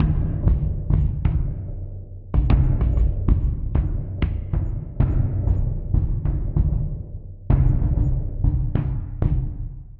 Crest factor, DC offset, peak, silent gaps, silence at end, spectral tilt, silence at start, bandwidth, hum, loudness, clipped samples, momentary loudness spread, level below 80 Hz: 16 dB; under 0.1%; -4 dBFS; none; 0 s; -11.5 dB/octave; 0 s; 3.8 kHz; none; -23 LUFS; under 0.1%; 10 LU; -24 dBFS